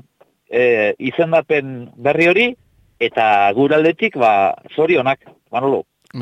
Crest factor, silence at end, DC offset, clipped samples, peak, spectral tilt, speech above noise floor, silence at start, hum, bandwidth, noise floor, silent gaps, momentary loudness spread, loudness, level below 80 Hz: 14 dB; 0 s; under 0.1%; under 0.1%; -4 dBFS; -6.5 dB/octave; 39 dB; 0.5 s; none; 9.2 kHz; -54 dBFS; none; 9 LU; -16 LUFS; -62 dBFS